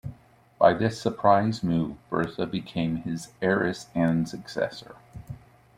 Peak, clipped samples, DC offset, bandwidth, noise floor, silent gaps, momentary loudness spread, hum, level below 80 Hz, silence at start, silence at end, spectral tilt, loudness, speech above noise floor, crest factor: -4 dBFS; under 0.1%; under 0.1%; 14.5 kHz; -53 dBFS; none; 21 LU; none; -56 dBFS; 0.05 s; 0.4 s; -6.5 dB/octave; -26 LUFS; 28 dB; 22 dB